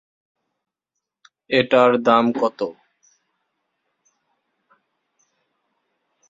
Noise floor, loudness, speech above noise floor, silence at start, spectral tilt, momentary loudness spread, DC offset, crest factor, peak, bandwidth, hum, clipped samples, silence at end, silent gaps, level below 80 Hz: -83 dBFS; -18 LUFS; 66 dB; 1.5 s; -6 dB/octave; 12 LU; under 0.1%; 22 dB; -2 dBFS; 7.6 kHz; none; under 0.1%; 3.55 s; none; -68 dBFS